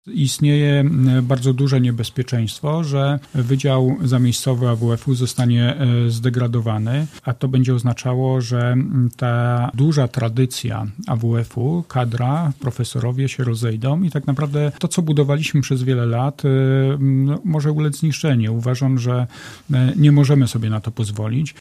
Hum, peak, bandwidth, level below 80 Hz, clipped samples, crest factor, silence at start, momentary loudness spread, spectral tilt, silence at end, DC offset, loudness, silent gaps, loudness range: none; -2 dBFS; 13 kHz; -52 dBFS; under 0.1%; 16 dB; 0.05 s; 6 LU; -7 dB/octave; 0.1 s; under 0.1%; -18 LUFS; none; 3 LU